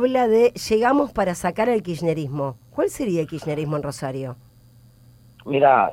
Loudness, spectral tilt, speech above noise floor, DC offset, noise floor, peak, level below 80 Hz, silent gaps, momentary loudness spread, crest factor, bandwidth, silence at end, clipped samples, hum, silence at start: -22 LUFS; -6 dB/octave; 30 dB; under 0.1%; -51 dBFS; -4 dBFS; -52 dBFS; none; 12 LU; 18 dB; 16.5 kHz; 0 s; under 0.1%; none; 0 s